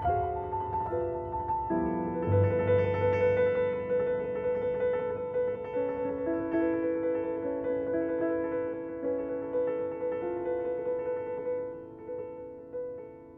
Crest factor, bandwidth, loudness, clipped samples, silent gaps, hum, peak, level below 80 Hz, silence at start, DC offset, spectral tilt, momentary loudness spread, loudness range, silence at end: 16 dB; 3.8 kHz; -31 LUFS; under 0.1%; none; none; -14 dBFS; -54 dBFS; 0 s; under 0.1%; -10.5 dB/octave; 12 LU; 5 LU; 0 s